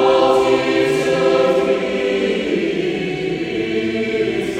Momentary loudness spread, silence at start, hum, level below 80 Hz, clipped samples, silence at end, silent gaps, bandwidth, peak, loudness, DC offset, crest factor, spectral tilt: 7 LU; 0 s; none; -48 dBFS; under 0.1%; 0 s; none; 12 kHz; -2 dBFS; -17 LUFS; under 0.1%; 14 dB; -5.5 dB/octave